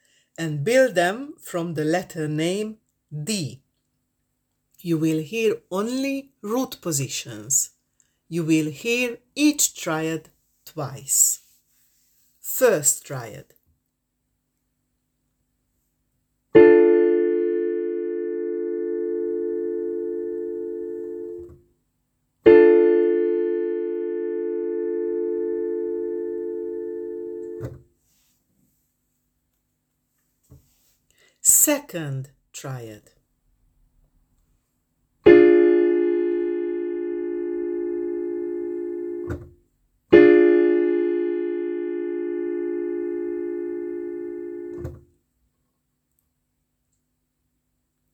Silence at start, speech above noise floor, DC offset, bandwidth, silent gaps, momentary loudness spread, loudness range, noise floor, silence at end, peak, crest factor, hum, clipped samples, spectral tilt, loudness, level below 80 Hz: 0.4 s; 52 dB; under 0.1%; 20 kHz; none; 19 LU; 12 LU; -76 dBFS; 3.15 s; 0 dBFS; 22 dB; none; under 0.1%; -4 dB/octave; -21 LUFS; -58 dBFS